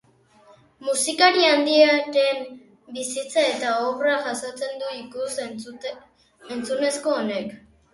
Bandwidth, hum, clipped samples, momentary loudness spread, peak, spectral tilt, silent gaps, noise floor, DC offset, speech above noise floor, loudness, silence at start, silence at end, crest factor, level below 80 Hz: 11.5 kHz; none; under 0.1%; 18 LU; -2 dBFS; -2 dB/octave; none; -55 dBFS; under 0.1%; 33 dB; -22 LUFS; 0.8 s; 0.35 s; 20 dB; -70 dBFS